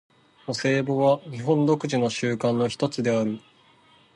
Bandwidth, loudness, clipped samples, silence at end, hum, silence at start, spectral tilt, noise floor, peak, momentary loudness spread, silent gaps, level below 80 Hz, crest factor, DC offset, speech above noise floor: 11.5 kHz; -24 LUFS; under 0.1%; 0.75 s; none; 0.5 s; -6 dB/octave; -57 dBFS; -8 dBFS; 8 LU; none; -66 dBFS; 16 dB; under 0.1%; 34 dB